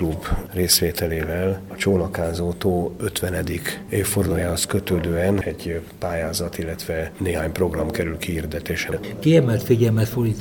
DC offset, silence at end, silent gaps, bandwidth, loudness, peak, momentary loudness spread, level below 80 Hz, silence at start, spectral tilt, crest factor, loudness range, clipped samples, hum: under 0.1%; 0 s; none; 19.5 kHz; -22 LUFS; -4 dBFS; 10 LU; -38 dBFS; 0 s; -5 dB/octave; 18 dB; 4 LU; under 0.1%; none